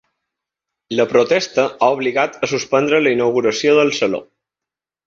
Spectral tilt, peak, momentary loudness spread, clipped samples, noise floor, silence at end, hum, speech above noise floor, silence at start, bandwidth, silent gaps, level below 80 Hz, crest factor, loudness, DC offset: -4 dB/octave; -2 dBFS; 6 LU; under 0.1%; -87 dBFS; 0.85 s; none; 71 dB; 0.9 s; 7.6 kHz; none; -60 dBFS; 16 dB; -16 LUFS; under 0.1%